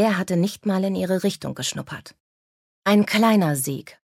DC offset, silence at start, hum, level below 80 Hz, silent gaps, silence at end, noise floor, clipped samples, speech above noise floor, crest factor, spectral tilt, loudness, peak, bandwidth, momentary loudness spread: under 0.1%; 0 s; none; -64 dBFS; 2.20-2.82 s; 0.15 s; under -90 dBFS; under 0.1%; over 69 dB; 16 dB; -5 dB/octave; -22 LUFS; -6 dBFS; 16 kHz; 10 LU